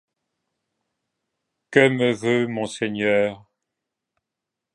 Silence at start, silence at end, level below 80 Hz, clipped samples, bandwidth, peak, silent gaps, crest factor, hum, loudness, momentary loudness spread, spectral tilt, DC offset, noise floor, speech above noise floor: 1.7 s; 1.4 s; -66 dBFS; under 0.1%; 11.5 kHz; -2 dBFS; none; 24 dB; none; -21 LUFS; 9 LU; -5.5 dB/octave; under 0.1%; -85 dBFS; 64 dB